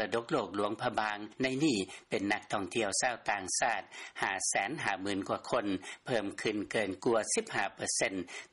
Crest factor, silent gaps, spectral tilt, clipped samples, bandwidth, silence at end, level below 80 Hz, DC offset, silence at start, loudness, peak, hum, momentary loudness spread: 16 dB; none; -3 dB/octave; under 0.1%; 11.5 kHz; 0.05 s; -70 dBFS; under 0.1%; 0 s; -33 LUFS; -18 dBFS; none; 5 LU